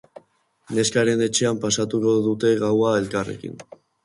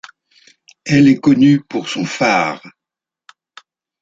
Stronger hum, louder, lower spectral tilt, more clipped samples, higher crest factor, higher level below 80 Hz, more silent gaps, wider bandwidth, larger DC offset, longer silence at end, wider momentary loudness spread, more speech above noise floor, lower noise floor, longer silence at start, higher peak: neither; second, -21 LUFS vs -14 LUFS; second, -4.5 dB/octave vs -6 dB/octave; neither; about the same, 16 dB vs 16 dB; about the same, -58 dBFS vs -56 dBFS; neither; first, 11.5 kHz vs 7.8 kHz; neither; second, 0.4 s vs 1.3 s; about the same, 11 LU vs 11 LU; second, 33 dB vs 73 dB; second, -53 dBFS vs -86 dBFS; second, 0.7 s vs 0.85 s; second, -6 dBFS vs 0 dBFS